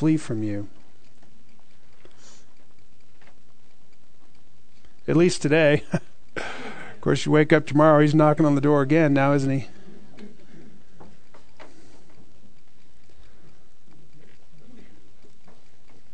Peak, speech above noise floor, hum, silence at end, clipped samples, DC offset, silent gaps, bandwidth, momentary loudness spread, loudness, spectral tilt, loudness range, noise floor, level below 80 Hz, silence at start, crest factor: -2 dBFS; 40 dB; none; 5.85 s; under 0.1%; 3%; none; 9.4 kHz; 18 LU; -21 LUFS; -7 dB/octave; 13 LU; -60 dBFS; -58 dBFS; 0 s; 22 dB